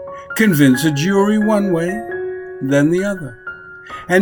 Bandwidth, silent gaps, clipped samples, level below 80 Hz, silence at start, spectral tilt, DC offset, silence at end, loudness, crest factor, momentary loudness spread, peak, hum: 19.5 kHz; none; under 0.1%; -50 dBFS; 0 s; -6 dB/octave; under 0.1%; 0 s; -16 LUFS; 16 dB; 19 LU; 0 dBFS; none